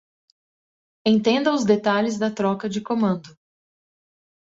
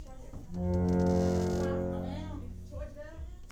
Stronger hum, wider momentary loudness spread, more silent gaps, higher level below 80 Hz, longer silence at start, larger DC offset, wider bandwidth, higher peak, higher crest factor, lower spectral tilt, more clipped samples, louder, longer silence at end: neither; second, 7 LU vs 18 LU; neither; second, -66 dBFS vs -46 dBFS; first, 1.05 s vs 0 s; neither; second, 7.8 kHz vs 9.6 kHz; first, -6 dBFS vs -16 dBFS; about the same, 18 dB vs 16 dB; second, -5.5 dB/octave vs -8 dB/octave; neither; first, -22 LUFS vs -31 LUFS; first, 1.25 s vs 0 s